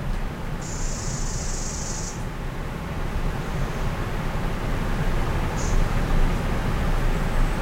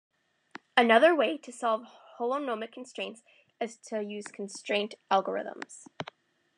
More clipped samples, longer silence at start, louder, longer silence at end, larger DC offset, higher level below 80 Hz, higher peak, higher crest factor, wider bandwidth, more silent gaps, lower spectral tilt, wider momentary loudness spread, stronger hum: neither; second, 0 s vs 0.75 s; about the same, -28 LUFS vs -29 LUFS; second, 0 s vs 0.55 s; neither; first, -26 dBFS vs -88 dBFS; about the same, -8 dBFS vs -8 dBFS; second, 14 dB vs 22 dB; first, 15.5 kHz vs 10.5 kHz; neither; first, -5 dB/octave vs -3.5 dB/octave; second, 6 LU vs 20 LU; neither